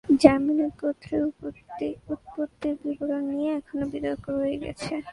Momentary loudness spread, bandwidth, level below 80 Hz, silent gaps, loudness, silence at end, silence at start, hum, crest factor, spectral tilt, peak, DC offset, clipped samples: 13 LU; 11.5 kHz; -54 dBFS; none; -27 LUFS; 0 s; 0.05 s; none; 26 dB; -6.5 dB/octave; 0 dBFS; under 0.1%; under 0.1%